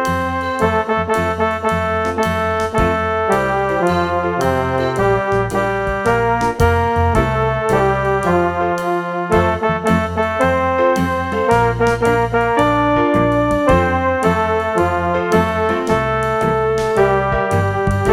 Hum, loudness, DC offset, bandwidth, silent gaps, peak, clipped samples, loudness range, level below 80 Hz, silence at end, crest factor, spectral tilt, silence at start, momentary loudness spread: none; -16 LUFS; under 0.1%; 16.5 kHz; none; 0 dBFS; under 0.1%; 2 LU; -32 dBFS; 0 s; 16 dB; -6.5 dB/octave; 0 s; 3 LU